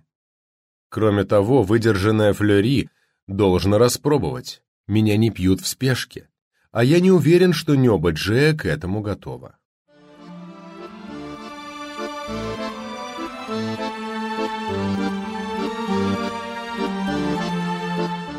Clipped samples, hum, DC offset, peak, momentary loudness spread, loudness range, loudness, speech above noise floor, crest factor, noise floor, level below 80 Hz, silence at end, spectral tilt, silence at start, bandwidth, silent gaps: under 0.1%; none; under 0.1%; -4 dBFS; 18 LU; 13 LU; -21 LUFS; 25 dB; 16 dB; -43 dBFS; -48 dBFS; 0 s; -6 dB/octave; 0.9 s; 16 kHz; 3.22-3.27 s, 4.68-4.84 s, 6.42-6.51 s, 9.65-9.85 s